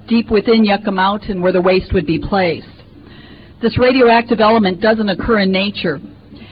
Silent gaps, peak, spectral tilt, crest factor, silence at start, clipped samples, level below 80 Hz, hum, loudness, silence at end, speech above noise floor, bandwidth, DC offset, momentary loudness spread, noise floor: none; -2 dBFS; -10 dB/octave; 12 dB; 0.1 s; under 0.1%; -36 dBFS; none; -14 LUFS; 0.05 s; 25 dB; 5.2 kHz; 0.2%; 8 LU; -39 dBFS